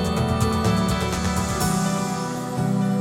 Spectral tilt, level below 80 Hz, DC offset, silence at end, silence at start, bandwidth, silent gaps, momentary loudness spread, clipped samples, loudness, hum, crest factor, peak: -5.5 dB/octave; -36 dBFS; under 0.1%; 0 s; 0 s; 17 kHz; none; 5 LU; under 0.1%; -23 LUFS; none; 14 dB; -8 dBFS